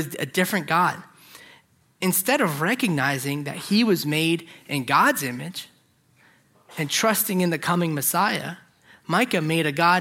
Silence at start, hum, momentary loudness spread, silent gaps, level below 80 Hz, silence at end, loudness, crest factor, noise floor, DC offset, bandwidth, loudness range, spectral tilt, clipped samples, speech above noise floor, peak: 0 s; none; 11 LU; none; -70 dBFS; 0 s; -22 LUFS; 20 dB; -61 dBFS; under 0.1%; 16.5 kHz; 2 LU; -4 dB/octave; under 0.1%; 38 dB; -4 dBFS